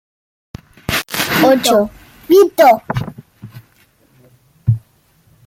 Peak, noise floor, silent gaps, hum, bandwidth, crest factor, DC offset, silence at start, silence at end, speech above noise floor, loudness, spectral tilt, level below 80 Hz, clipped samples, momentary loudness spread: 0 dBFS; -54 dBFS; none; none; 16.5 kHz; 16 dB; under 0.1%; 0.9 s; 0.7 s; 43 dB; -14 LUFS; -5 dB/octave; -44 dBFS; under 0.1%; 13 LU